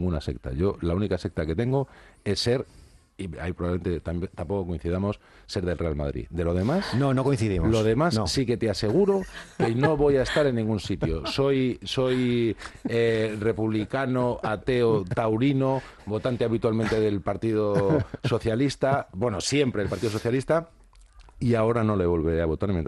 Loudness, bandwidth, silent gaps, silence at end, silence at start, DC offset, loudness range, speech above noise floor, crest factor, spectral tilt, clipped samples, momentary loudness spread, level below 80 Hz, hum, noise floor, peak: -26 LUFS; 12.5 kHz; none; 0 s; 0 s; under 0.1%; 5 LU; 26 dB; 16 dB; -6.5 dB/octave; under 0.1%; 8 LU; -42 dBFS; none; -51 dBFS; -8 dBFS